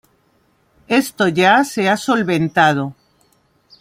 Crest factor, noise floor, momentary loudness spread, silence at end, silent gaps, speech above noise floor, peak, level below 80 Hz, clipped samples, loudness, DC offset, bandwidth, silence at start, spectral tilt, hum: 16 dB; -59 dBFS; 5 LU; 0.9 s; none; 44 dB; 0 dBFS; -60 dBFS; under 0.1%; -15 LUFS; under 0.1%; 16.5 kHz; 0.9 s; -5 dB/octave; none